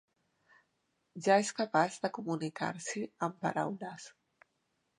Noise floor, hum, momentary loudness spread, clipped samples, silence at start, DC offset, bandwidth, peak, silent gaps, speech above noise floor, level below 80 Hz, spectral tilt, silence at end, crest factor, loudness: -80 dBFS; none; 16 LU; under 0.1%; 1.15 s; under 0.1%; 11 kHz; -12 dBFS; none; 46 dB; -84 dBFS; -4.5 dB/octave; 0.9 s; 24 dB; -34 LUFS